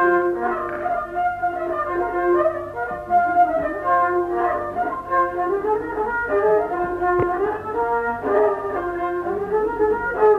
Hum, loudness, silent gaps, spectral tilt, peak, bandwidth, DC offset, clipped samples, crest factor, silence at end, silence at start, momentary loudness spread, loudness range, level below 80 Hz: 50 Hz at -55 dBFS; -21 LUFS; none; -8 dB/octave; -6 dBFS; 5.4 kHz; under 0.1%; under 0.1%; 16 dB; 0 s; 0 s; 6 LU; 1 LU; -48 dBFS